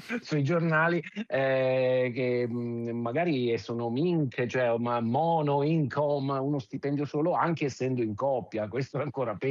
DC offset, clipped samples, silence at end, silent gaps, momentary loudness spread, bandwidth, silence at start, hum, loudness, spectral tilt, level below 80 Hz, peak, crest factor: under 0.1%; under 0.1%; 0 s; none; 7 LU; 7.6 kHz; 0 s; none; -28 LUFS; -7.5 dB/octave; -76 dBFS; -14 dBFS; 14 dB